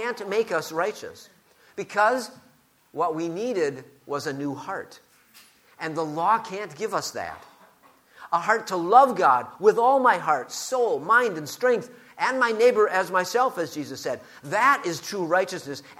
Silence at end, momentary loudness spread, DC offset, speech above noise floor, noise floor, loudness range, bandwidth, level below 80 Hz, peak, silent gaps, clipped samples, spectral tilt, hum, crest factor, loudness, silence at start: 0.05 s; 16 LU; under 0.1%; 33 dB; -57 dBFS; 9 LU; 16 kHz; -74 dBFS; -4 dBFS; none; under 0.1%; -4 dB/octave; none; 22 dB; -24 LUFS; 0 s